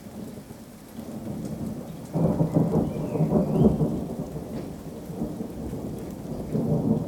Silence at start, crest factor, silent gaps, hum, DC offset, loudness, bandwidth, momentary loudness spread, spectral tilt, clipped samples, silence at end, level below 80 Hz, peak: 0 s; 22 dB; none; none; under 0.1%; -27 LUFS; 18.5 kHz; 17 LU; -9 dB/octave; under 0.1%; 0 s; -44 dBFS; -6 dBFS